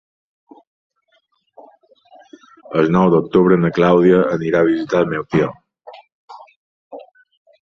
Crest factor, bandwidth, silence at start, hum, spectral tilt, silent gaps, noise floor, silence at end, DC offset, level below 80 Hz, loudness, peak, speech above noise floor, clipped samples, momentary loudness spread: 16 dB; 6.6 kHz; 2.7 s; none; -8.5 dB/octave; 6.12-6.28 s, 6.56-6.91 s; -63 dBFS; 0.65 s; under 0.1%; -54 dBFS; -15 LUFS; -2 dBFS; 49 dB; under 0.1%; 11 LU